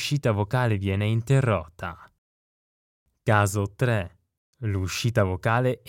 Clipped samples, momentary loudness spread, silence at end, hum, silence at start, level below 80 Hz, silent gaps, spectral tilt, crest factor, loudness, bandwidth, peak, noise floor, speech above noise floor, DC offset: under 0.1%; 12 LU; 0.1 s; none; 0 s; -52 dBFS; 2.18-3.06 s, 4.37-4.53 s; -6 dB/octave; 20 dB; -25 LUFS; 16 kHz; -6 dBFS; under -90 dBFS; over 66 dB; under 0.1%